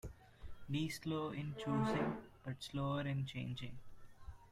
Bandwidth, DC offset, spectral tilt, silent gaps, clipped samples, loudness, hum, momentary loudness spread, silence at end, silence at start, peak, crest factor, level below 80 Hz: 15 kHz; under 0.1%; -6.5 dB/octave; none; under 0.1%; -42 LUFS; none; 21 LU; 0 s; 0.05 s; -26 dBFS; 16 dB; -60 dBFS